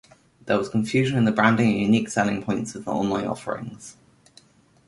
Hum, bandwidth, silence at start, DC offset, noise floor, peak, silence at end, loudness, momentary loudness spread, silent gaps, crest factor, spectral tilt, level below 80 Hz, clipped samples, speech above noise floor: none; 11.5 kHz; 0.45 s; under 0.1%; -55 dBFS; -4 dBFS; 0.95 s; -23 LUFS; 14 LU; none; 20 dB; -6 dB/octave; -58 dBFS; under 0.1%; 33 dB